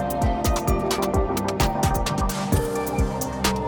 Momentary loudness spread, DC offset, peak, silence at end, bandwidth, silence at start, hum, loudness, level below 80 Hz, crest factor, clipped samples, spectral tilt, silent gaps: 3 LU; under 0.1%; -6 dBFS; 0 s; 19.5 kHz; 0 s; none; -24 LUFS; -30 dBFS; 16 dB; under 0.1%; -5 dB/octave; none